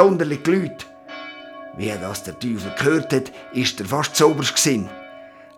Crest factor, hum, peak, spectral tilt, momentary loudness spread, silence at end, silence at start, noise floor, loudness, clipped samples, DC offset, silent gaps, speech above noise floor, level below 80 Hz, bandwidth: 22 dB; none; 0 dBFS; -4 dB/octave; 19 LU; 0.3 s; 0 s; -42 dBFS; -21 LUFS; under 0.1%; under 0.1%; none; 22 dB; -60 dBFS; 18 kHz